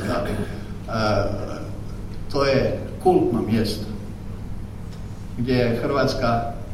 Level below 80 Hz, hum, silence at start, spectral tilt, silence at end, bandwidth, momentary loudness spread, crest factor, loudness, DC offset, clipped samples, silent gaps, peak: -34 dBFS; none; 0 s; -6.5 dB/octave; 0 s; 15 kHz; 15 LU; 18 dB; -23 LUFS; under 0.1%; under 0.1%; none; -6 dBFS